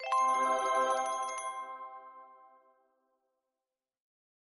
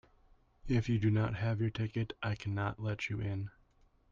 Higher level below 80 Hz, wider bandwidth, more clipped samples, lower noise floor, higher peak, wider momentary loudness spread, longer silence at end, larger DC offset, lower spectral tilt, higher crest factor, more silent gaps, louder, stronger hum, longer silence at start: second, -84 dBFS vs -54 dBFS; first, 10.5 kHz vs 7.2 kHz; neither; first, under -90 dBFS vs -68 dBFS; about the same, -20 dBFS vs -20 dBFS; first, 19 LU vs 8 LU; first, 2.25 s vs 0.6 s; neither; second, 0 dB/octave vs -7.5 dB/octave; about the same, 16 dB vs 16 dB; neither; first, -32 LUFS vs -35 LUFS; neither; second, 0 s vs 0.65 s